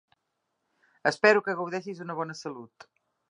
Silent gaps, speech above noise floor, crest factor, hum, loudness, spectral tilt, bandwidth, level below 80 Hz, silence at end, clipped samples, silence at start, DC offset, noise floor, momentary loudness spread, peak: none; 53 dB; 26 dB; none; -27 LUFS; -4.5 dB/octave; 10.5 kHz; -82 dBFS; 0.65 s; under 0.1%; 1.05 s; under 0.1%; -80 dBFS; 17 LU; -4 dBFS